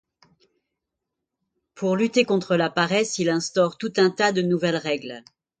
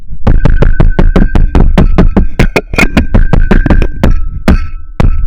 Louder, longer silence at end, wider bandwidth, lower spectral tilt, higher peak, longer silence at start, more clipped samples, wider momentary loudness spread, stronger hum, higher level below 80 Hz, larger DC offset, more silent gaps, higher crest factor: second, -22 LUFS vs -10 LUFS; first, 0.4 s vs 0 s; about the same, 9.4 kHz vs 9.4 kHz; second, -4.5 dB/octave vs -7.5 dB/octave; second, -4 dBFS vs 0 dBFS; first, 1.75 s vs 0 s; second, under 0.1% vs 1%; first, 8 LU vs 5 LU; neither; second, -68 dBFS vs -8 dBFS; neither; neither; first, 20 dB vs 6 dB